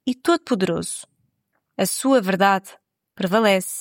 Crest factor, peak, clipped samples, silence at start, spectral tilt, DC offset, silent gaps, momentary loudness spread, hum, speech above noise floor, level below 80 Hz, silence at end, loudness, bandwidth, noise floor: 18 dB; -4 dBFS; under 0.1%; 0.05 s; -4 dB/octave; under 0.1%; none; 11 LU; none; 52 dB; -64 dBFS; 0 s; -20 LUFS; 17 kHz; -72 dBFS